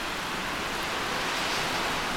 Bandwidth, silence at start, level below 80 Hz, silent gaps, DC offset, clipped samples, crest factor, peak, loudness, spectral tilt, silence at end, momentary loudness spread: 19 kHz; 0 s; -48 dBFS; none; under 0.1%; under 0.1%; 14 dB; -16 dBFS; -29 LUFS; -2 dB/octave; 0 s; 3 LU